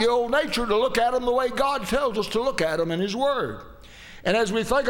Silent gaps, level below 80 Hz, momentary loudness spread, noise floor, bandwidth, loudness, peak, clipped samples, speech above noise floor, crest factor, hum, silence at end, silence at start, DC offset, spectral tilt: none; -44 dBFS; 6 LU; -44 dBFS; 18 kHz; -24 LUFS; -6 dBFS; under 0.1%; 21 dB; 18 dB; none; 0 s; 0 s; under 0.1%; -4.5 dB/octave